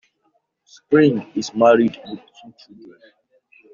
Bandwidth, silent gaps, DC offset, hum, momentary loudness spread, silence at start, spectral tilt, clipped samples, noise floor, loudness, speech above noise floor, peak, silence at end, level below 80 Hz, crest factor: 7.2 kHz; none; under 0.1%; none; 21 LU; 0.9 s; -5.5 dB/octave; under 0.1%; -67 dBFS; -17 LUFS; 48 dB; -2 dBFS; 1.55 s; -66 dBFS; 18 dB